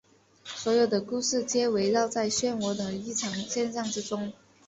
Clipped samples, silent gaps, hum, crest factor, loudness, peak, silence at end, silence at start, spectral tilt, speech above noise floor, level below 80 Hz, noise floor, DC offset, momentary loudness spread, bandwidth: under 0.1%; none; none; 16 dB; -28 LUFS; -12 dBFS; 0.35 s; 0.45 s; -3.5 dB/octave; 20 dB; -66 dBFS; -48 dBFS; under 0.1%; 9 LU; 8.4 kHz